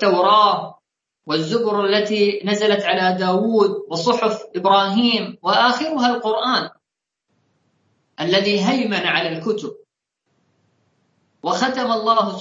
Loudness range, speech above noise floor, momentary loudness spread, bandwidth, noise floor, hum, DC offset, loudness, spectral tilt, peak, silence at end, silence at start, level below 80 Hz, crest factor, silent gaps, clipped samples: 5 LU; 64 dB; 9 LU; 7.8 kHz; -82 dBFS; none; under 0.1%; -18 LUFS; -4.5 dB/octave; -2 dBFS; 0 s; 0 s; -70 dBFS; 16 dB; none; under 0.1%